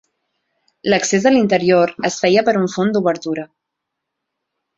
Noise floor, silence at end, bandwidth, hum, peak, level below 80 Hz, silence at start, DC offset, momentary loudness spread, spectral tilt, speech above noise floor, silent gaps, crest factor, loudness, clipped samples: -79 dBFS; 1.35 s; 8 kHz; none; -2 dBFS; -58 dBFS; 0.85 s; under 0.1%; 10 LU; -4.5 dB/octave; 64 dB; none; 16 dB; -16 LUFS; under 0.1%